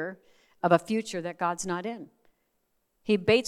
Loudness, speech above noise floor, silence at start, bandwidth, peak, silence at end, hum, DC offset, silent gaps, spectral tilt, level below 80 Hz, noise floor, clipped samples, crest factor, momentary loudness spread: -29 LUFS; 48 dB; 0 s; 13 kHz; -6 dBFS; 0 s; none; under 0.1%; none; -5 dB/octave; -66 dBFS; -75 dBFS; under 0.1%; 24 dB; 14 LU